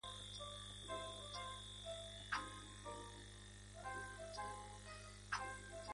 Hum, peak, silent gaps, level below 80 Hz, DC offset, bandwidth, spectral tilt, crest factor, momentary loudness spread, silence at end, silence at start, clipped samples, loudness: 50 Hz at -60 dBFS; -30 dBFS; none; -62 dBFS; under 0.1%; 11.5 kHz; -2.5 dB/octave; 22 dB; 9 LU; 0 s; 0.05 s; under 0.1%; -50 LUFS